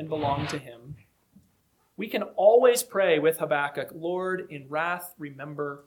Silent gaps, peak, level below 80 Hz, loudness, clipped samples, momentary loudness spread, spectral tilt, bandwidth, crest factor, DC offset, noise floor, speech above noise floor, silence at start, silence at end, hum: none; -6 dBFS; -64 dBFS; -26 LUFS; under 0.1%; 18 LU; -4.5 dB/octave; 19 kHz; 20 dB; under 0.1%; -68 dBFS; 42 dB; 0 s; 0.05 s; none